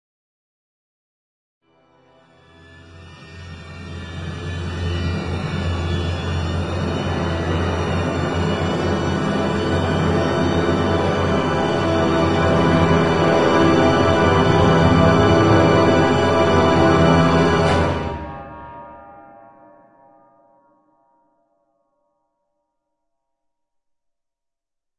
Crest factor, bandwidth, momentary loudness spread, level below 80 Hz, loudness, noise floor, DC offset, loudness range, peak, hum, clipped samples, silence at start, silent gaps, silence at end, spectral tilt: 18 dB; 11 kHz; 16 LU; -40 dBFS; -17 LUFS; -80 dBFS; under 0.1%; 14 LU; -2 dBFS; none; under 0.1%; 2.75 s; none; 5.65 s; -6.5 dB/octave